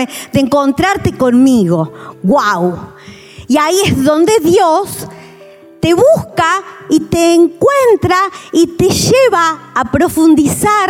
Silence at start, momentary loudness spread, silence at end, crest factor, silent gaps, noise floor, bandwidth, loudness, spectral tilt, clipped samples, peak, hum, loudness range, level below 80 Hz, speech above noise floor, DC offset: 0 s; 8 LU; 0 s; 10 dB; none; -37 dBFS; 17 kHz; -11 LUFS; -5 dB/octave; under 0.1%; 0 dBFS; none; 2 LU; -42 dBFS; 27 dB; under 0.1%